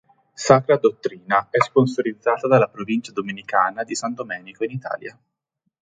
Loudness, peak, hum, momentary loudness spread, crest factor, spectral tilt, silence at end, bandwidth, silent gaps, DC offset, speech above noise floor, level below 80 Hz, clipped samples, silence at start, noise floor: -21 LUFS; 0 dBFS; none; 13 LU; 22 dB; -5.5 dB/octave; 0.7 s; 9.6 kHz; none; under 0.1%; 55 dB; -62 dBFS; under 0.1%; 0.4 s; -76 dBFS